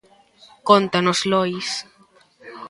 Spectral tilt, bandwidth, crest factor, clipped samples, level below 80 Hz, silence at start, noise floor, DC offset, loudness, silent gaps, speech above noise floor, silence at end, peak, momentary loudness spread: -4 dB/octave; 11.5 kHz; 22 dB; under 0.1%; -64 dBFS; 0.65 s; -55 dBFS; under 0.1%; -19 LUFS; none; 35 dB; 0 s; 0 dBFS; 13 LU